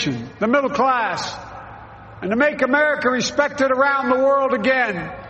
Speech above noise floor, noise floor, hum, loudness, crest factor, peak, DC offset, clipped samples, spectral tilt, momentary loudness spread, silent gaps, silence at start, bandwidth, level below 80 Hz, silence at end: 20 dB; -39 dBFS; none; -18 LUFS; 16 dB; -4 dBFS; under 0.1%; under 0.1%; -4.5 dB/octave; 13 LU; none; 0 s; 8.4 kHz; -52 dBFS; 0 s